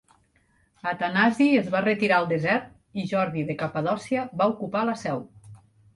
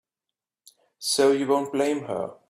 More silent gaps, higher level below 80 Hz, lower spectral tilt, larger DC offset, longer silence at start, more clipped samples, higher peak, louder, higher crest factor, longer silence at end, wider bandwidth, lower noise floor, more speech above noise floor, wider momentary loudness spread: neither; first, -64 dBFS vs -70 dBFS; first, -6.5 dB/octave vs -3.5 dB/octave; neither; second, 0.85 s vs 1 s; neither; about the same, -8 dBFS vs -10 dBFS; about the same, -25 LUFS vs -24 LUFS; about the same, 18 dB vs 16 dB; first, 0.4 s vs 0.15 s; second, 11.5 kHz vs 15 kHz; second, -65 dBFS vs -88 dBFS; second, 41 dB vs 64 dB; about the same, 11 LU vs 10 LU